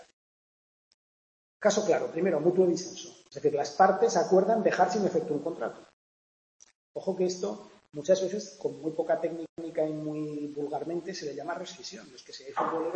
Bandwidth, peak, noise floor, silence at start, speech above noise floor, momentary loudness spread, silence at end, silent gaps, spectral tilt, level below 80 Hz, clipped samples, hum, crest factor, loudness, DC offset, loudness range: 8.6 kHz; -8 dBFS; under -90 dBFS; 1.6 s; over 62 dB; 16 LU; 0 s; 5.93-6.60 s, 6.75-6.95 s, 9.49-9.56 s; -5 dB/octave; -76 dBFS; under 0.1%; none; 22 dB; -29 LUFS; under 0.1%; 8 LU